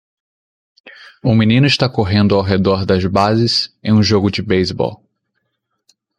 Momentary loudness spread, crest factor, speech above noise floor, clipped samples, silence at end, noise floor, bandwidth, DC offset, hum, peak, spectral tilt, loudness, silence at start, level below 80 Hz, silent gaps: 5 LU; 16 dB; 57 dB; under 0.1%; 1.25 s; -71 dBFS; 10 kHz; under 0.1%; none; 0 dBFS; -6.5 dB/octave; -14 LUFS; 0.85 s; -46 dBFS; none